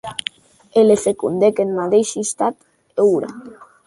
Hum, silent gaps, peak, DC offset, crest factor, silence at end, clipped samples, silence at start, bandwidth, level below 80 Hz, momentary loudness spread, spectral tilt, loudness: none; none; -2 dBFS; under 0.1%; 16 dB; 0.2 s; under 0.1%; 0.05 s; 11.5 kHz; -60 dBFS; 14 LU; -4.5 dB/octave; -18 LUFS